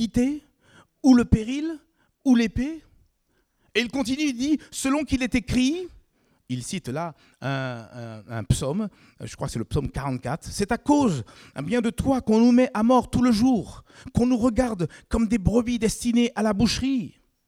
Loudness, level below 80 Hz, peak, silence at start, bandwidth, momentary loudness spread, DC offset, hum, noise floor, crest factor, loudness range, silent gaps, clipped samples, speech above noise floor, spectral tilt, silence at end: -24 LUFS; -42 dBFS; -4 dBFS; 0 s; 14.5 kHz; 15 LU; under 0.1%; none; -69 dBFS; 20 dB; 8 LU; none; under 0.1%; 46 dB; -5.5 dB/octave; 0.4 s